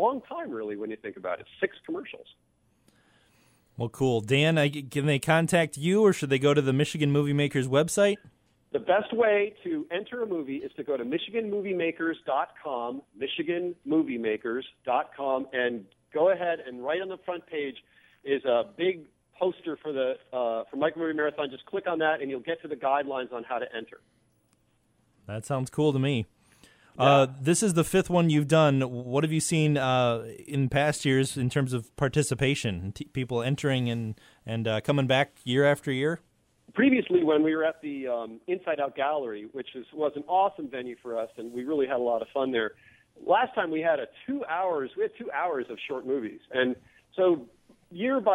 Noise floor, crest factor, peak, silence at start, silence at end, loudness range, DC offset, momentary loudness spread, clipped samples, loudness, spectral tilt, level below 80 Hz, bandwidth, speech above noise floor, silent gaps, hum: -68 dBFS; 20 dB; -8 dBFS; 0 s; 0 s; 7 LU; under 0.1%; 12 LU; under 0.1%; -28 LUFS; -5.5 dB/octave; -62 dBFS; 16 kHz; 41 dB; none; none